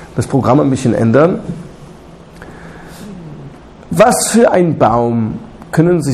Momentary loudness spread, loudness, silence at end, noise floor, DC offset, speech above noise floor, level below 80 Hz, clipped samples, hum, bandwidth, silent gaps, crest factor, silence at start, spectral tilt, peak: 23 LU; -12 LUFS; 0 s; -36 dBFS; under 0.1%; 25 dB; -40 dBFS; under 0.1%; none; 14 kHz; none; 14 dB; 0 s; -6 dB/octave; 0 dBFS